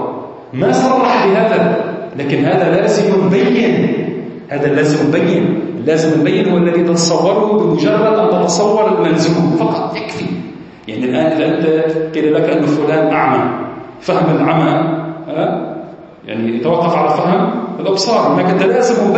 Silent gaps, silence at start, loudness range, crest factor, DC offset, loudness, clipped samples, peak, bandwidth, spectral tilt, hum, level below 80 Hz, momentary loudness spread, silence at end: none; 0 s; 3 LU; 12 dB; under 0.1%; -13 LUFS; under 0.1%; 0 dBFS; 8.6 kHz; -6 dB/octave; none; -56 dBFS; 10 LU; 0 s